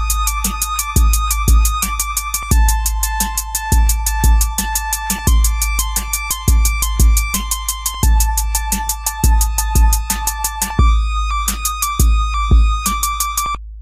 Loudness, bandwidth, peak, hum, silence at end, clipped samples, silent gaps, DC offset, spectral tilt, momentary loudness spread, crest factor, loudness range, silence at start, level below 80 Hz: -16 LUFS; 16 kHz; 0 dBFS; none; 0 s; under 0.1%; none; under 0.1%; -3 dB/octave; 4 LU; 14 dB; 1 LU; 0 s; -16 dBFS